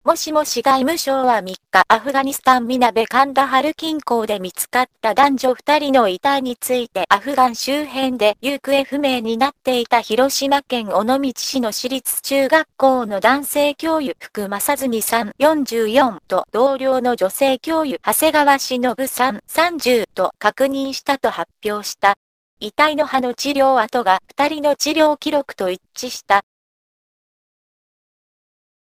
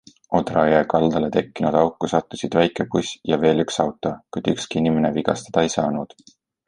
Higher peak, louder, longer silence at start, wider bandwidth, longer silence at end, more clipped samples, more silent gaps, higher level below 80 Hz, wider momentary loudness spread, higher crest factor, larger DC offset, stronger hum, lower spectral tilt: about the same, 0 dBFS vs -2 dBFS; first, -17 LUFS vs -21 LUFS; second, 0.05 s vs 0.3 s; first, 15.5 kHz vs 11 kHz; first, 2.45 s vs 0.6 s; neither; first, 22.17-22.57 s vs none; about the same, -56 dBFS vs -52 dBFS; about the same, 6 LU vs 7 LU; about the same, 18 dB vs 18 dB; neither; neither; second, -2.5 dB/octave vs -5.5 dB/octave